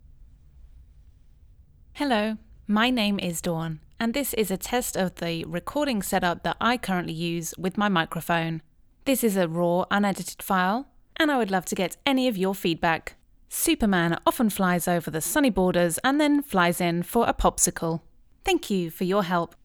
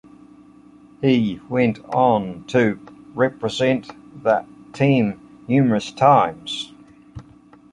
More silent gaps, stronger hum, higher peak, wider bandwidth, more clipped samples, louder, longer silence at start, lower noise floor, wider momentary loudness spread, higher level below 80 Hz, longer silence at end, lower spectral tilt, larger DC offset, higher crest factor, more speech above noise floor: neither; neither; second, -6 dBFS vs -2 dBFS; first, over 20 kHz vs 10.5 kHz; neither; second, -25 LUFS vs -20 LUFS; second, 0.2 s vs 1 s; first, -53 dBFS vs -48 dBFS; second, 8 LU vs 12 LU; first, -48 dBFS vs -56 dBFS; second, 0.2 s vs 0.5 s; second, -4.5 dB/octave vs -6.5 dB/octave; neither; about the same, 20 dB vs 20 dB; about the same, 28 dB vs 30 dB